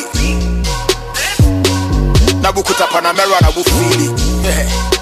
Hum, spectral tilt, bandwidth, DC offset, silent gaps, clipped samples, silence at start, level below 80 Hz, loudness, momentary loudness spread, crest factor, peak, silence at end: none; -4.5 dB/octave; 15 kHz; under 0.1%; none; under 0.1%; 0 s; -18 dBFS; -13 LUFS; 5 LU; 12 dB; 0 dBFS; 0 s